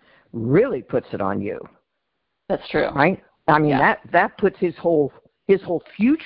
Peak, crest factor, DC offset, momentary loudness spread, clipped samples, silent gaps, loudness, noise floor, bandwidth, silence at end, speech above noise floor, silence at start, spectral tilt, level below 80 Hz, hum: -2 dBFS; 20 dB; under 0.1%; 11 LU; under 0.1%; none; -21 LUFS; -76 dBFS; 5.4 kHz; 0 s; 56 dB; 0.35 s; -11.5 dB/octave; -52 dBFS; none